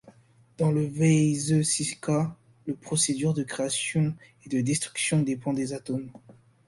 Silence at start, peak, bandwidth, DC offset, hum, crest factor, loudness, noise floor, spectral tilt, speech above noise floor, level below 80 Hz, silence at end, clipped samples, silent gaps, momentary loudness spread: 0.05 s; -10 dBFS; 11.5 kHz; under 0.1%; none; 16 dB; -26 LUFS; -56 dBFS; -5 dB/octave; 29 dB; -62 dBFS; 0.35 s; under 0.1%; none; 11 LU